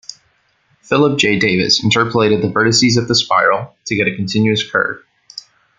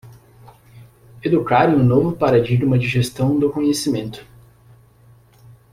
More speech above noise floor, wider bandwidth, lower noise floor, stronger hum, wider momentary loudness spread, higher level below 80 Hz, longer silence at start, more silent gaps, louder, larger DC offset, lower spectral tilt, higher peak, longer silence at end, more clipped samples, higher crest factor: first, 45 dB vs 33 dB; second, 9.6 kHz vs 15.5 kHz; first, -59 dBFS vs -50 dBFS; neither; first, 20 LU vs 10 LU; about the same, -52 dBFS vs -48 dBFS; about the same, 0.1 s vs 0.05 s; neither; first, -14 LUFS vs -17 LUFS; neither; second, -4 dB/octave vs -6.5 dB/octave; about the same, 0 dBFS vs -2 dBFS; second, 0.4 s vs 1.5 s; neither; about the same, 16 dB vs 18 dB